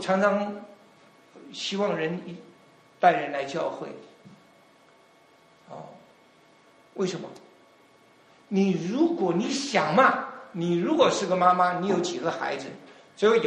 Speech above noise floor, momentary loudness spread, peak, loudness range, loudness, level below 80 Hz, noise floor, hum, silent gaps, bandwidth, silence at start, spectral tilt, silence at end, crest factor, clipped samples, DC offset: 33 dB; 22 LU; -6 dBFS; 16 LU; -25 LUFS; -72 dBFS; -58 dBFS; none; none; 10.5 kHz; 0 s; -5 dB/octave; 0 s; 22 dB; under 0.1%; under 0.1%